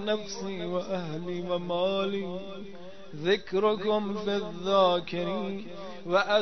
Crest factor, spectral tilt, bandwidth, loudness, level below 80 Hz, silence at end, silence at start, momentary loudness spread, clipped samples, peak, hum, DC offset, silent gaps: 20 dB; -5.5 dB/octave; 6.4 kHz; -29 LUFS; -64 dBFS; 0 s; 0 s; 16 LU; under 0.1%; -10 dBFS; none; 0.7%; none